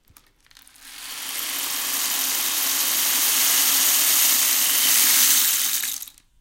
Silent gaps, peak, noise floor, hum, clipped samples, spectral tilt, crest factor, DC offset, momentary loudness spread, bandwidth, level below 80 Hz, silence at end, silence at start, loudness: none; -4 dBFS; -55 dBFS; none; under 0.1%; 3 dB/octave; 18 dB; under 0.1%; 13 LU; 17 kHz; -62 dBFS; 0.3 s; 0.85 s; -17 LUFS